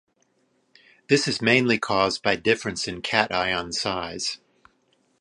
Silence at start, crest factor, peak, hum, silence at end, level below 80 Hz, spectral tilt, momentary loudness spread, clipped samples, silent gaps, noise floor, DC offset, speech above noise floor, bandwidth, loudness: 1.1 s; 24 dB; 0 dBFS; none; 0.85 s; -56 dBFS; -3.5 dB/octave; 9 LU; under 0.1%; none; -68 dBFS; under 0.1%; 44 dB; 11.5 kHz; -23 LUFS